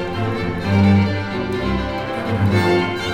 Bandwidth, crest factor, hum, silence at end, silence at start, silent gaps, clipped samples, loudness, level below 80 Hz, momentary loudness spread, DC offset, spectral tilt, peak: 11 kHz; 14 dB; none; 0 s; 0 s; none; under 0.1%; -19 LUFS; -36 dBFS; 8 LU; under 0.1%; -7 dB/octave; -4 dBFS